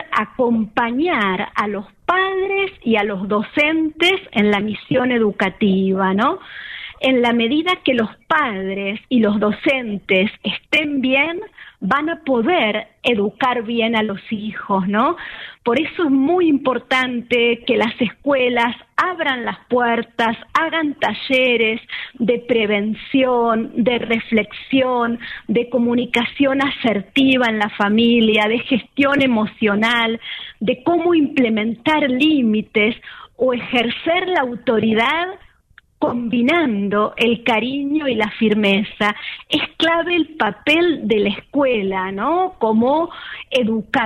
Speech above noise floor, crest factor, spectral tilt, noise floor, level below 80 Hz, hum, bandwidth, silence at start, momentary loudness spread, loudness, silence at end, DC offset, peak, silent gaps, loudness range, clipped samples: 34 dB; 14 dB; -6 dB/octave; -52 dBFS; -54 dBFS; none; 10.5 kHz; 0 s; 6 LU; -18 LUFS; 0 s; under 0.1%; -4 dBFS; none; 2 LU; under 0.1%